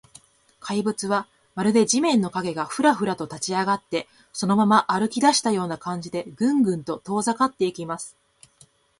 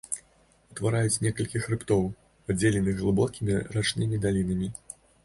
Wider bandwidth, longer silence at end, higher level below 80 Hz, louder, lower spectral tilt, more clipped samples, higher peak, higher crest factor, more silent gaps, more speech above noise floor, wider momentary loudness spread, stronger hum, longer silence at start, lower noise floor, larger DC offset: about the same, 11.5 kHz vs 11.5 kHz; first, 0.9 s vs 0.5 s; second, -64 dBFS vs -48 dBFS; first, -23 LUFS vs -28 LUFS; about the same, -4.5 dB/octave vs -5.5 dB/octave; neither; first, -4 dBFS vs -10 dBFS; about the same, 20 dB vs 18 dB; neither; about the same, 35 dB vs 36 dB; about the same, 12 LU vs 10 LU; neither; first, 0.65 s vs 0.1 s; second, -57 dBFS vs -62 dBFS; neither